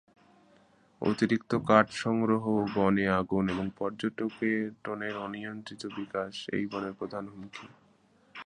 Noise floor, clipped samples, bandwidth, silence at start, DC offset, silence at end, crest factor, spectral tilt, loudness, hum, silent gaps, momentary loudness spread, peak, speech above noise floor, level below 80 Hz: -64 dBFS; under 0.1%; 10 kHz; 1 s; under 0.1%; 0.05 s; 26 dB; -6.5 dB/octave; -30 LUFS; none; none; 15 LU; -6 dBFS; 34 dB; -62 dBFS